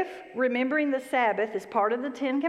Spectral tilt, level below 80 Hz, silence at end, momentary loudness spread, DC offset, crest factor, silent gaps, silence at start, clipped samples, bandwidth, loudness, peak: -5 dB/octave; -78 dBFS; 0 s; 5 LU; under 0.1%; 16 dB; none; 0 s; under 0.1%; 13.5 kHz; -27 LUFS; -12 dBFS